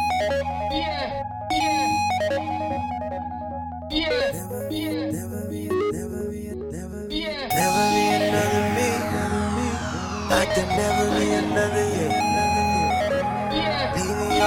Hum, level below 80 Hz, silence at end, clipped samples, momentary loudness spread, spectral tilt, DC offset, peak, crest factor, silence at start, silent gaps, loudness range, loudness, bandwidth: none; -42 dBFS; 0 s; under 0.1%; 10 LU; -4.5 dB/octave; under 0.1%; -6 dBFS; 18 dB; 0 s; none; 5 LU; -24 LUFS; 17.5 kHz